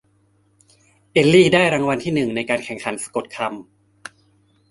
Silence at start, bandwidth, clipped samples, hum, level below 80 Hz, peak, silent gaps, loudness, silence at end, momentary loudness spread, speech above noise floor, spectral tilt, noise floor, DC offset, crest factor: 1.15 s; 11.5 kHz; under 0.1%; none; -56 dBFS; -2 dBFS; none; -18 LUFS; 1.1 s; 27 LU; 42 dB; -5 dB/octave; -60 dBFS; under 0.1%; 20 dB